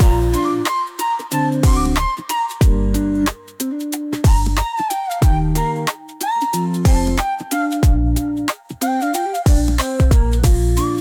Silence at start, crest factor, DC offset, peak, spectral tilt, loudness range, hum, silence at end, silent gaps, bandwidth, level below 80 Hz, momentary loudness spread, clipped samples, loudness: 0 s; 12 dB; under 0.1%; -4 dBFS; -6 dB/octave; 2 LU; none; 0 s; none; 19 kHz; -20 dBFS; 7 LU; under 0.1%; -18 LUFS